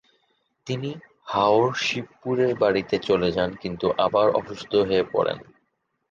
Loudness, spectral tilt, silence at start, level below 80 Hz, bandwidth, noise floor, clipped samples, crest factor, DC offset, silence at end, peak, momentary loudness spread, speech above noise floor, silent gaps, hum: -23 LUFS; -5.5 dB/octave; 0.65 s; -54 dBFS; 7.4 kHz; -74 dBFS; under 0.1%; 18 dB; under 0.1%; 0.7 s; -6 dBFS; 10 LU; 51 dB; none; none